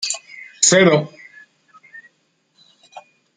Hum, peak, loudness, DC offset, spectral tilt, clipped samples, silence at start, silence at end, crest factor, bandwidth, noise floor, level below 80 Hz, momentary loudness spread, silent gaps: none; 0 dBFS; -15 LUFS; under 0.1%; -3 dB/octave; under 0.1%; 0 s; 0.35 s; 22 dB; 9.8 kHz; -65 dBFS; -64 dBFS; 22 LU; none